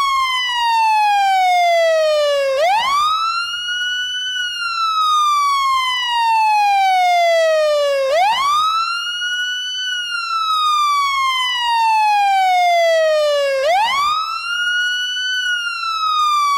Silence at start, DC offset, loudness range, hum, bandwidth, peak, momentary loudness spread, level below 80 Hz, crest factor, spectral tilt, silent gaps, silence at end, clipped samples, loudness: 0 s; under 0.1%; 2 LU; none; 17 kHz; -8 dBFS; 5 LU; -58 dBFS; 8 dB; 2 dB/octave; none; 0 s; under 0.1%; -15 LUFS